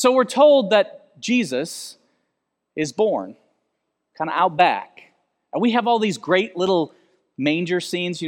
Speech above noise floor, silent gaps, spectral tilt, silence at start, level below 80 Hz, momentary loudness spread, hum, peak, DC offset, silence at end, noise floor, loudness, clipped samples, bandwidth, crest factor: 57 dB; none; -4.5 dB/octave; 0 s; -74 dBFS; 15 LU; none; -2 dBFS; under 0.1%; 0 s; -77 dBFS; -20 LUFS; under 0.1%; 16 kHz; 20 dB